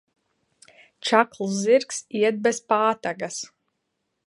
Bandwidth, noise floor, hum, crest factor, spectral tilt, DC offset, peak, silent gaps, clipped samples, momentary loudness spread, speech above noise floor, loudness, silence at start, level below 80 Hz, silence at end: 11.5 kHz; -77 dBFS; none; 24 dB; -3.5 dB/octave; under 0.1%; -2 dBFS; none; under 0.1%; 11 LU; 55 dB; -23 LUFS; 1.05 s; -76 dBFS; 0.8 s